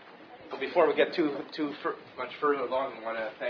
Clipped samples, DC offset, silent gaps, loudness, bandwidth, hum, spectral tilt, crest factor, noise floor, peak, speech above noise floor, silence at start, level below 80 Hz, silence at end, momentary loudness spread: under 0.1%; under 0.1%; none; -30 LUFS; 5.4 kHz; none; -6.5 dB/octave; 20 dB; -50 dBFS; -10 dBFS; 20 dB; 0 s; -74 dBFS; 0 s; 14 LU